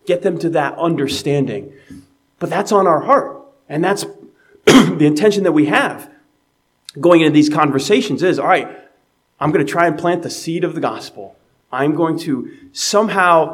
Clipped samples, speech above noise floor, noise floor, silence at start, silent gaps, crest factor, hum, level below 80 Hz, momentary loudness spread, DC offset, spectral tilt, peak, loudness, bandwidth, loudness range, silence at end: under 0.1%; 48 dB; -63 dBFS; 0.05 s; none; 16 dB; none; -58 dBFS; 15 LU; under 0.1%; -5 dB/octave; 0 dBFS; -15 LUFS; 16 kHz; 5 LU; 0 s